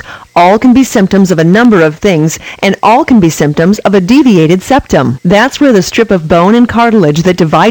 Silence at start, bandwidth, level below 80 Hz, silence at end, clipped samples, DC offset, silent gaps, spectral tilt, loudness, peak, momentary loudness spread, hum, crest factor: 0.05 s; 18.5 kHz; -34 dBFS; 0 s; 4%; under 0.1%; none; -6 dB/octave; -7 LUFS; 0 dBFS; 4 LU; none; 6 dB